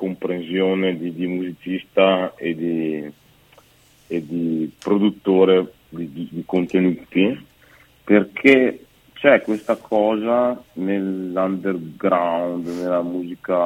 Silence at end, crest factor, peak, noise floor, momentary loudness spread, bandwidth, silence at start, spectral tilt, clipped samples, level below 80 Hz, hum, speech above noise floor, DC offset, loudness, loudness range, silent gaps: 0 s; 20 dB; 0 dBFS; -54 dBFS; 13 LU; 15.5 kHz; 0 s; -7.5 dB/octave; under 0.1%; -62 dBFS; none; 34 dB; under 0.1%; -20 LUFS; 5 LU; none